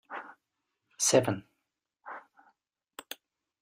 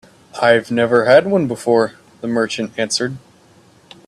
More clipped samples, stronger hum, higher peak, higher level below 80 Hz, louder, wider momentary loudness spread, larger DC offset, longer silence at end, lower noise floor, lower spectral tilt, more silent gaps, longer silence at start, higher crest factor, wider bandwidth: neither; neither; second, -10 dBFS vs 0 dBFS; second, -72 dBFS vs -60 dBFS; second, -27 LUFS vs -16 LUFS; first, 25 LU vs 13 LU; neither; second, 0.45 s vs 0.9 s; first, -85 dBFS vs -49 dBFS; second, -3 dB/octave vs -4.5 dB/octave; neither; second, 0.1 s vs 0.35 s; first, 26 dB vs 18 dB; first, 15.5 kHz vs 12.5 kHz